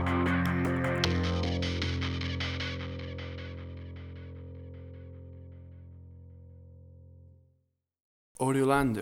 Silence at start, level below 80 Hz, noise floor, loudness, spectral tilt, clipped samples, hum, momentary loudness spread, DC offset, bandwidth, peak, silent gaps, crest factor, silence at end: 0 s; -48 dBFS; -76 dBFS; -31 LUFS; -6 dB/octave; under 0.1%; none; 23 LU; under 0.1%; 15 kHz; -12 dBFS; 8.02-8.35 s; 22 dB; 0 s